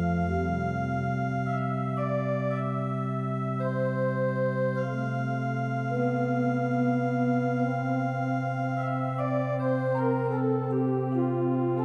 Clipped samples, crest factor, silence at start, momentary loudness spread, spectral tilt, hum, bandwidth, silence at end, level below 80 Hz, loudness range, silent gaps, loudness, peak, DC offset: under 0.1%; 12 dB; 0 s; 3 LU; -9.5 dB/octave; none; 6.6 kHz; 0 s; -54 dBFS; 2 LU; none; -28 LUFS; -16 dBFS; under 0.1%